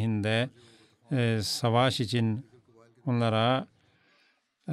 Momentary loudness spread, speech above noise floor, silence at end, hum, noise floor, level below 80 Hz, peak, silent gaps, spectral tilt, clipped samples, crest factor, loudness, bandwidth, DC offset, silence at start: 12 LU; 42 dB; 0 s; none; -69 dBFS; -70 dBFS; -12 dBFS; none; -5.5 dB/octave; under 0.1%; 18 dB; -28 LUFS; 14.5 kHz; under 0.1%; 0 s